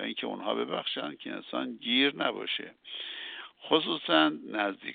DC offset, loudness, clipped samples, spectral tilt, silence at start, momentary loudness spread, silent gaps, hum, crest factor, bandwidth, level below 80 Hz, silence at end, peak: under 0.1%; -30 LUFS; under 0.1%; -0.5 dB/octave; 0 s; 14 LU; none; none; 22 dB; 4.7 kHz; -84 dBFS; 0 s; -10 dBFS